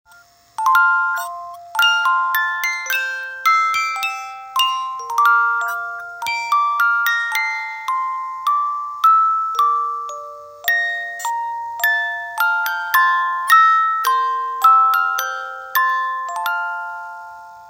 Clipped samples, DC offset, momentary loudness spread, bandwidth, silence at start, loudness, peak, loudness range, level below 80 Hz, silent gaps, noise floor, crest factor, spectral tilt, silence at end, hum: under 0.1%; under 0.1%; 12 LU; 16.5 kHz; 0.6 s; -17 LUFS; 0 dBFS; 4 LU; -70 dBFS; none; -49 dBFS; 18 dB; 2.5 dB/octave; 0 s; none